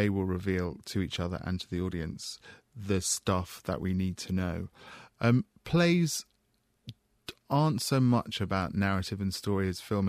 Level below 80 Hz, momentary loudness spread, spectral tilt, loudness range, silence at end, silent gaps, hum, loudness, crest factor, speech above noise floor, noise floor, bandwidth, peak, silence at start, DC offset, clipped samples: -54 dBFS; 20 LU; -5.5 dB/octave; 4 LU; 0 s; none; none; -31 LUFS; 16 dB; 43 dB; -73 dBFS; 15.5 kHz; -14 dBFS; 0 s; under 0.1%; under 0.1%